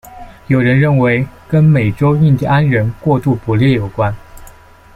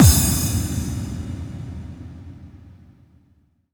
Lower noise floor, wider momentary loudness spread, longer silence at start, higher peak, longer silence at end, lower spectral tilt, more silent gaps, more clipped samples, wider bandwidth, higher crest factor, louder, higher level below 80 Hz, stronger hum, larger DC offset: second, -40 dBFS vs -60 dBFS; second, 7 LU vs 23 LU; about the same, 0.05 s vs 0 s; about the same, -2 dBFS vs -2 dBFS; second, 0.45 s vs 1.05 s; first, -9 dB/octave vs -4.5 dB/octave; neither; neither; second, 12.5 kHz vs over 20 kHz; second, 12 dB vs 20 dB; first, -13 LUFS vs -22 LUFS; second, -38 dBFS vs -30 dBFS; neither; neither